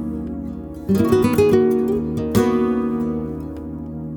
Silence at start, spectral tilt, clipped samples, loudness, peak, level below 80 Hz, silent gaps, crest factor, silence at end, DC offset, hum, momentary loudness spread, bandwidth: 0 s; -7.5 dB/octave; under 0.1%; -19 LUFS; -2 dBFS; -40 dBFS; none; 16 dB; 0 s; under 0.1%; none; 15 LU; over 20 kHz